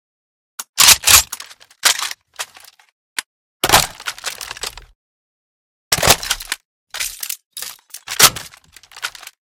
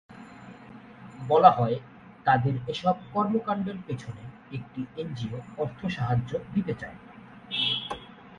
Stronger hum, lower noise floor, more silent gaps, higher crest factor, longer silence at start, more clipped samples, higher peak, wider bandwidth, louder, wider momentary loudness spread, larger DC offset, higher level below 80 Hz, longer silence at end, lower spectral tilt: neither; about the same, -44 dBFS vs -47 dBFS; first, 0.69-0.73 s, 2.92-3.16 s, 3.26-3.60 s, 4.95-5.91 s, 6.65-6.87 s, 7.45-7.51 s vs none; second, 20 dB vs 26 dB; first, 0.6 s vs 0.1 s; first, 0.2% vs under 0.1%; about the same, 0 dBFS vs -2 dBFS; first, over 20 kHz vs 10.5 kHz; first, -13 LUFS vs -27 LUFS; about the same, 21 LU vs 23 LU; neither; first, -42 dBFS vs -58 dBFS; first, 0.35 s vs 0.05 s; second, 0 dB/octave vs -7 dB/octave